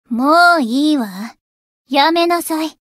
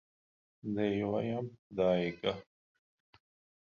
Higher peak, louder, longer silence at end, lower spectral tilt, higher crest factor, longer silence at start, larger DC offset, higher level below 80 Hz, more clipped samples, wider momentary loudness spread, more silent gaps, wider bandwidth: first, 0 dBFS vs -16 dBFS; first, -14 LUFS vs -34 LUFS; second, 0.2 s vs 1.2 s; second, -3.5 dB/octave vs -5.5 dB/octave; second, 14 dB vs 20 dB; second, 0.1 s vs 0.65 s; neither; about the same, -68 dBFS vs -66 dBFS; neither; first, 15 LU vs 11 LU; first, 1.41-1.85 s vs 1.59-1.70 s; first, 16 kHz vs 7 kHz